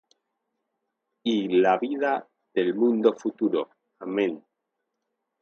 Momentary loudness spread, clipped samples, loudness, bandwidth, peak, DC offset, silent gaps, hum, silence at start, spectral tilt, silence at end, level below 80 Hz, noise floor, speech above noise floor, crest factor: 10 LU; under 0.1%; -25 LUFS; 6.8 kHz; -6 dBFS; under 0.1%; none; none; 1.25 s; -6.5 dB/octave; 1.05 s; -76 dBFS; -81 dBFS; 57 dB; 20 dB